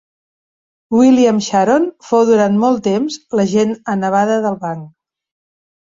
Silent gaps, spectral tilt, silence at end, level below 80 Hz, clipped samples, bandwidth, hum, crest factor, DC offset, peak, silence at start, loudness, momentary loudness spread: none; -6 dB/octave; 1.05 s; -58 dBFS; under 0.1%; 7.8 kHz; none; 14 dB; under 0.1%; -2 dBFS; 0.9 s; -14 LUFS; 8 LU